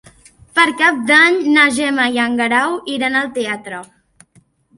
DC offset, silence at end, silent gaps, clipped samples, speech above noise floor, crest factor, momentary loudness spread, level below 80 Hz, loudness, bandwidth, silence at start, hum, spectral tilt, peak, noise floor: under 0.1%; 0.95 s; none; under 0.1%; 39 dB; 16 dB; 12 LU; -58 dBFS; -14 LUFS; 11.5 kHz; 0.55 s; none; -2.5 dB/octave; 0 dBFS; -54 dBFS